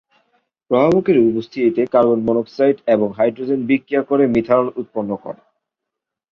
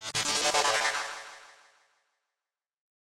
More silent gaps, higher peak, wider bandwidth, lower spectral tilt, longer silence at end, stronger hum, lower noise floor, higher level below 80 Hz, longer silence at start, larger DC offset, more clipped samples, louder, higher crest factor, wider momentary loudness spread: neither; first, -2 dBFS vs -12 dBFS; second, 6.6 kHz vs 16.5 kHz; first, -8.5 dB/octave vs 0 dB/octave; second, 1 s vs 1.65 s; neither; second, -82 dBFS vs under -90 dBFS; first, -56 dBFS vs -70 dBFS; first, 0.7 s vs 0 s; neither; neither; first, -17 LUFS vs -27 LUFS; about the same, 16 dB vs 20 dB; second, 10 LU vs 17 LU